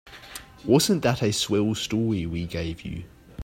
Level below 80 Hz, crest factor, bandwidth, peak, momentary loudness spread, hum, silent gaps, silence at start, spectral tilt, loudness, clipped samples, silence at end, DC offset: -48 dBFS; 20 dB; 16 kHz; -6 dBFS; 19 LU; none; none; 0.05 s; -5 dB/octave; -24 LUFS; under 0.1%; 0 s; under 0.1%